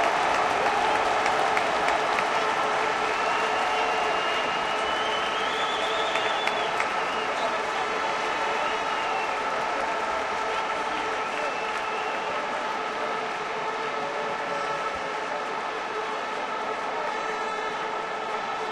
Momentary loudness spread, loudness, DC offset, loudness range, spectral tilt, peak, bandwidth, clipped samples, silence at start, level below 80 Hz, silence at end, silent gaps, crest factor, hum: 6 LU; -26 LUFS; under 0.1%; 5 LU; -2 dB/octave; -8 dBFS; 13.5 kHz; under 0.1%; 0 s; -60 dBFS; 0 s; none; 20 dB; none